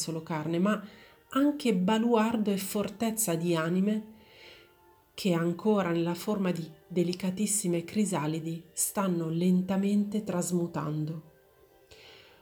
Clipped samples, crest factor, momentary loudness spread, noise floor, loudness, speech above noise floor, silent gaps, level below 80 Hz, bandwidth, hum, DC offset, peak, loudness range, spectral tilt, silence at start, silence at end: under 0.1%; 18 dB; 8 LU; -61 dBFS; -29 LUFS; 33 dB; none; -70 dBFS; over 20 kHz; none; under 0.1%; -12 dBFS; 3 LU; -5.5 dB/octave; 0 s; 0.25 s